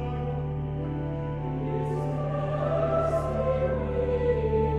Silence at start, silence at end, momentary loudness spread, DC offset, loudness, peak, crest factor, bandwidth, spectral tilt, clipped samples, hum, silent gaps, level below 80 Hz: 0 s; 0 s; 6 LU; under 0.1%; -28 LUFS; -14 dBFS; 14 dB; 8 kHz; -9 dB/octave; under 0.1%; none; none; -38 dBFS